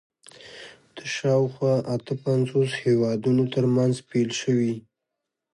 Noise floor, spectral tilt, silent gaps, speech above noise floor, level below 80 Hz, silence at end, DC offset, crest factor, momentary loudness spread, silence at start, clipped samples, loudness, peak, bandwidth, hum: -83 dBFS; -6.5 dB/octave; none; 60 dB; -66 dBFS; 0.75 s; under 0.1%; 14 dB; 17 LU; 0.4 s; under 0.1%; -24 LUFS; -10 dBFS; 11.5 kHz; none